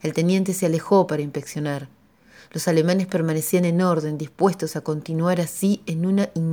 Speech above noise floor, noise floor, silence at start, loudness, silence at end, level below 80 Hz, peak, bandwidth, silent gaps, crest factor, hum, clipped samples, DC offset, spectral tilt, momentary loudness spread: 30 dB; -51 dBFS; 0.05 s; -22 LUFS; 0 s; -66 dBFS; -4 dBFS; over 20 kHz; none; 18 dB; none; under 0.1%; under 0.1%; -6 dB/octave; 9 LU